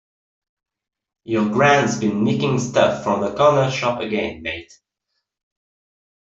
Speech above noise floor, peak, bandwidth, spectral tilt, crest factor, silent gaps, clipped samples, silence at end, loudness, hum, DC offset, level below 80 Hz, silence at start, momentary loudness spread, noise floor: 58 dB; -2 dBFS; 7.8 kHz; -5.5 dB/octave; 18 dB; none; under 0.1%; 1.75 s; -19 LUFS; none; under 0.1%; -56 dBFS; 1.25 s; 10 LU; -77 dBFS